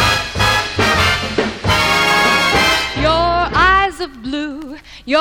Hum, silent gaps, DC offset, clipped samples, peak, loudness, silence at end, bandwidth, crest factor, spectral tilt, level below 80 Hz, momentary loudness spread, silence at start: none; none; under 0.1%; under 0.1%; 0 dBFS; -14 LUFS; 0 s; 18 kHz; 14 dB; -3.5 dB/octave; -30 dBFS; 12 LU; 0 s